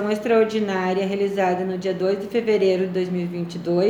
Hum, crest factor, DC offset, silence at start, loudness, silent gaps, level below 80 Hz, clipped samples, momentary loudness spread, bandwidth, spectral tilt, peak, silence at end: none; 14 dB; under 0.1%; 0 s; -22 LUFS; none; -64 dBFS; under 0.1%; 6 LU; 13 kHz; -7 dB/octave; -6 dBFS; 0 s